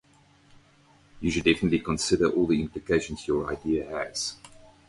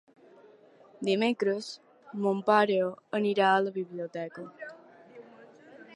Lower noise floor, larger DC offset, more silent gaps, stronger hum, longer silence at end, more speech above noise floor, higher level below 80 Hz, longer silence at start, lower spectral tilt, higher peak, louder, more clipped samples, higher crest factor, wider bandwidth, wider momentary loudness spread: about the same, -59 dBFS vs -57 dBFS; neither; neither; neither; first, 0.4 s vs 0 s; first, 33 dB vs 29 dB; first, -48 dBFS vs -84 dBFS; first, 1.15 s vs 1 s; about the same, -4.5 dB/octave vs -5.5 dB/octave; about the same, -8 dBFS vs -10 dBFS; about the same, -27 LUFS vs -28 LUFS; neither; about the same, 20 dB vs 20 dB; about the same, 11.5 kHz vs 11 kHz; second, 9 LU vs 19 LU